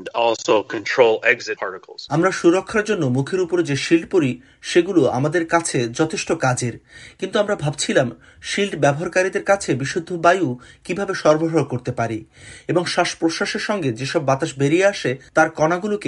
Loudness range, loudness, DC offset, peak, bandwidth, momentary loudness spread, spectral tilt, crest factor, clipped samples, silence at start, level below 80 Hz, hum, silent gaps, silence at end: 2 LU; -20 LUFS; under 0.1%; 0 dBFS; 11.5 kHz; 9 LU; -5 dB/octave; 20 dB; under 0.1%; 0 s; -56 dBFS; none; none; 0 s